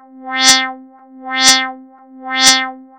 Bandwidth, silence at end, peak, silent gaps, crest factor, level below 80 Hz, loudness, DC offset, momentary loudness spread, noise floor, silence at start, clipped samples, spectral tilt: over 20 kHz; 0.15 s; 0 dBFS; none; 16 dB; -54 dBFS; -11 LUFS; 0.1%; 14 LU; -38 dBFS; 0.15 s; 0.2%; 1.5 dB/octave